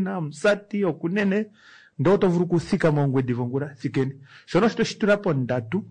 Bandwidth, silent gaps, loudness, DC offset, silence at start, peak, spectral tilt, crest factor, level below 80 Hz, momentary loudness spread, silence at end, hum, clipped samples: 9.8 kHz; none; -23 LUFS; under 0.1%; 0 s; -10 dBFS; -7 dB/octave; 12 dB; -56 dBFS; 7 LU; 0 s; none; under 0.1%